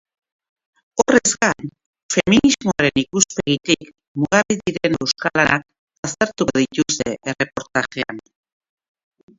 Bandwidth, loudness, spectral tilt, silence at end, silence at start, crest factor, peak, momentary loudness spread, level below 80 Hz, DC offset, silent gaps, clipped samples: 8 kHz; -19 LUFS; -3.5 dB/octave; 1.2 s; 0.95 s; 20 dB; 0 dBFS; 13 LU; -50 dBFS; under 0.1%; 1.86-1.93 s, 2.03-2.09 s, 4.08-4.15 s, 5.79-5.88 s, 5.98-6.03 s; under 0.1%